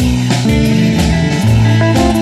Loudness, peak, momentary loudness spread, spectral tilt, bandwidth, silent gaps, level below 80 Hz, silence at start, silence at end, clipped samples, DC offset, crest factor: -11 LUFS; 0 dBFS; 2 LU; -6 dB/octave; 13.5 kHz; none; -22 dBFS; 0 s; 0 s; under 0.1%; under 0.1%; 10 dB